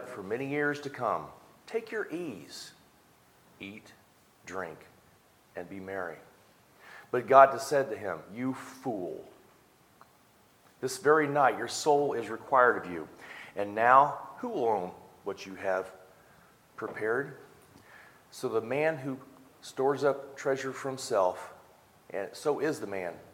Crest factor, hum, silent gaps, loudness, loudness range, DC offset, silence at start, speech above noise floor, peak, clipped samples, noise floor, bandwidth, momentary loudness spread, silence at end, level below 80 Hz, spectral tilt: 26 dB; none; none; -30 LUFS; 16 LU; under 0.1%; 0 s; 33 dB; -4 dBFS; under 0.1%; -62 dBFS; 17 kHz; 21 LU; 0.1 s; -76 dBFS; -4.5 dB/octave